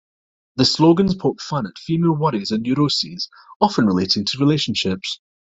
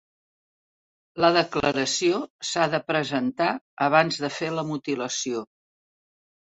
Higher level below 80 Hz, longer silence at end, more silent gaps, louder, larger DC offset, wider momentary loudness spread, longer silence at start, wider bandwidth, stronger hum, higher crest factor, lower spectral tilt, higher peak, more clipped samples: first, -52 dBFS vs -62 dBFS; second, 0.4 s vs 1.15 s; second, 3.56-3.60 s vs 2.30-2.39 s, 3.61-3.77 s; first, -19 LUFS vs -24 LUFS; neither; first, 11 LU vs 8 LU; second, 0.55 s vs 1.15 s; about the same, 8.2 kHz vs 8.4 kHz; neither; about the same, 18 dB vs 22 dB; first, -5.5 dB/octave vs -3.5 dB/octave; about the same, -2 dBFS vs -4 dBFS; neither